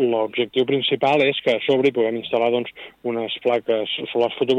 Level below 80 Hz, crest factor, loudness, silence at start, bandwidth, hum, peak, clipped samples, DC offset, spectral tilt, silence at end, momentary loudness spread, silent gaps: -66 dBFS; 14 dB; -21 LUFS; 0 s; 8 kHz; none; -8 dBFS; under 0.1%; under 0.1%; -6 dB/octave; 0 s; 7 LU; none